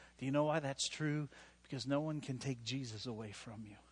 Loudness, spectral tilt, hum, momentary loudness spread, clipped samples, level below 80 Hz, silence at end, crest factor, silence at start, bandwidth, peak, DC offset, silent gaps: -40 LUFS; -5 dB/octave; none; 14 LU; under 0.1%; -70 dBFS; 0.1 s; 18 dB; 0 s; 11 kHz; -22 dBFS; under 0.1%; none